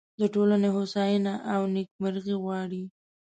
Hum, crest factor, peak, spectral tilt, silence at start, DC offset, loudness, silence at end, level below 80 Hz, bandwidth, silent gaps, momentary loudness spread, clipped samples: none; 14 dB; -14 dBFS; -7.5 dB/octave; 0.2 s; under 0.1%; -27 LUFS; 0.35 s; -72 dBFS; 8.6 kHz; 1.91-1.99 s; 10 LU; under 0.1%